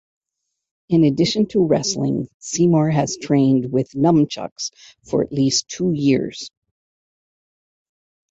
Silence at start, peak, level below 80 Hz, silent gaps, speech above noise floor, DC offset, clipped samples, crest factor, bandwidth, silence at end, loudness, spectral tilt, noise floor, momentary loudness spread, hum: 0.9 s; -4 dBFS; -56 dBFS; 2.34-2.40 s, 4.51-4.56 s; 61 dB; under 0.1%; under 0.1%; 16 dB; 8 kHz; 1.85 s; -19 LUFS; -5.5 dB/octave; -79 dBFS; 11 LU; none